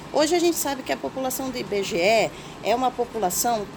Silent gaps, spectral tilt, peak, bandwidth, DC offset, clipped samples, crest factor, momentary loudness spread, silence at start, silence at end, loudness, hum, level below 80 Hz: none; -3 dB/octave; -6 dBFS; over 20 kHz; under 0.1%; under 0.1%; 18 dB; 8 LU; 0 s; 0 s; -24 LUFS; none; -52 dBFS